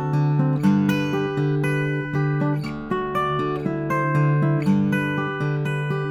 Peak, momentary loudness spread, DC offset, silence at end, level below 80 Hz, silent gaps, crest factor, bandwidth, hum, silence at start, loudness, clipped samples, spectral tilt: -8 dBFS; 5 LU; under 0.1%; 0 s; -54 dBFS; none; 14 dB; 12 kHz; none; 0 s; -22 LUFS; under 0.1%; -8 dB/octave